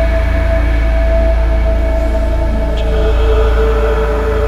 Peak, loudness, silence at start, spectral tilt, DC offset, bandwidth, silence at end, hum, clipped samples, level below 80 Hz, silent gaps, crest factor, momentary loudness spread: -2 dBFS; -14 LUFS; 0 s; -7.5 dB/octave; under 0.1%; 6.6 kHz; 0 s; none; under 0.1%; -12 dBFS; none; 10 dB; 3 LU